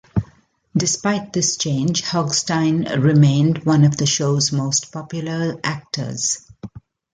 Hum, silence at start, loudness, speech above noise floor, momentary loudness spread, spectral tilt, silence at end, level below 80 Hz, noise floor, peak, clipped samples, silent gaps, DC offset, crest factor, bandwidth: none; 0.15 s; -19 LUFS; 35 dB; 11 LU; -4.5 dB/octave; 0.35 s; -50 dBFS; -53 dBFS; -4 dBFS; under 0.1%; none; under 0.1%; 16 dB; 9.4 kHz